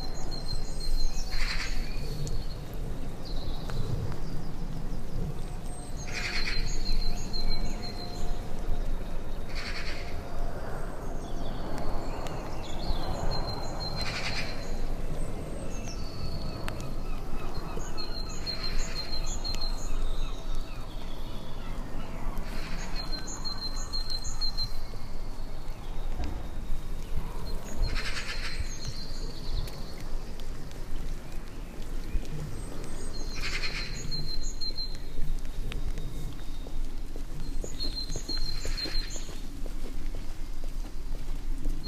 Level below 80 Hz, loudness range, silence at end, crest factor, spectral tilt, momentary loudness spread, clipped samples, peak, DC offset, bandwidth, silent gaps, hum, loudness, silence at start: -30 dBFS; 4 LU; 0 s; 14 dB; -4 dB/octave; 9 LU; under 0.1%; -12 dBFS; under 0.1%; 11.5 kHz; none; none; -37 LUFS; 0 s